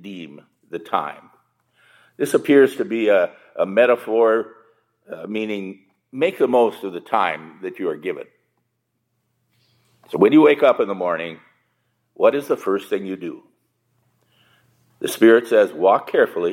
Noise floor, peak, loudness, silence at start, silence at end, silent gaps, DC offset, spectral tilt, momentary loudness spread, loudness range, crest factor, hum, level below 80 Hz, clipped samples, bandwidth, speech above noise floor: -73 dBFS; -2 dBFS; -19 LUFS; 0.05 s; 0 s; none; under 0.1%; -5.5 dB/octave; 19 LU; 6 LU; 20 dB; none; -78 dBFS; under 0.1%; 16.5 kHz; 55 dB